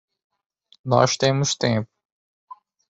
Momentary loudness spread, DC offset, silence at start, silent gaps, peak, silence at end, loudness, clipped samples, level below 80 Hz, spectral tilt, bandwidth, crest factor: 16 LU; under 0.1%; 0.85 s; none; -2 dBFS; 1.05 s; -21 LUFS; under 0.1%; -60 dBFS; -4.5 dB/octave; 8 kHz; 22 dB